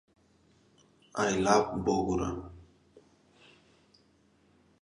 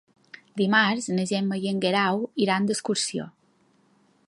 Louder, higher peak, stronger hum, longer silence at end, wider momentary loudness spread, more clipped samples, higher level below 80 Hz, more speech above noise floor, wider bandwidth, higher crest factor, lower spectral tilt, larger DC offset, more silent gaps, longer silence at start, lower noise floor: second, -30 LUFS vs -24 LUFS; second, -10 dBFS vs -6 dBFS; neither; first, 2.2 s vs 1 s; first, 16 LU vs 9 LU; neither; first, -54 dBFS vs -72 dBFS; about the same, 38 dB vs 39 dB; about the same, 11 kHz vs 11.5 kHz; about the same, 24 dB vs 20 dB; about the same, -5 dB/octave vs -4 dB/octave; neither; neither; first, 1.15 s vs 0.55 s; about the same, -66 dBFS vs -64 dBFS